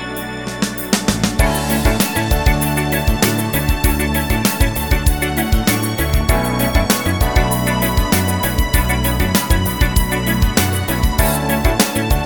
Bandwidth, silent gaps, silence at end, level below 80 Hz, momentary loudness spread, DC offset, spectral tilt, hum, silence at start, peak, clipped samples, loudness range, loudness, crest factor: 19.5 kHz; none; 0 s; -20 dBFS; 2 LU; 0.7%; -4.5 dB/octave; none; 0 s; 0 dBFS; under 0.1%; 1 LU; -16 LUFS; 16 dB